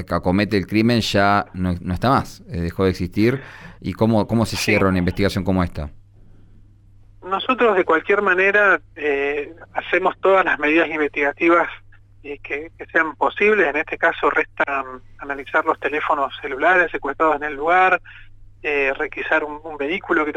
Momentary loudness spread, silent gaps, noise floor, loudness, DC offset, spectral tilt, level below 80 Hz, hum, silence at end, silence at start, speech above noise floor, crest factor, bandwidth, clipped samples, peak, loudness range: 13 LU; none; -48 dBFS; -19 LUFS; under 0.1%; -6 dB/octave; -44 dBFS; none; 0 s; 0 s; 28 dB; 14 dB; 17.5 kHz; under 0.1%; -4 dBFS; 3 LU